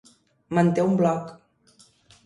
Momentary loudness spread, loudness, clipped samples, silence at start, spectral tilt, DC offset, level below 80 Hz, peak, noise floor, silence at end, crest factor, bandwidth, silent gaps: 10 LU; -23 LUFS; under 0.1%; 0.5 s; -8 dB/octave; under 0.1%; -64 dBFS; -8 dBFS; -58 dBFS; 0.9 s; 18 dB; 11 kHz; none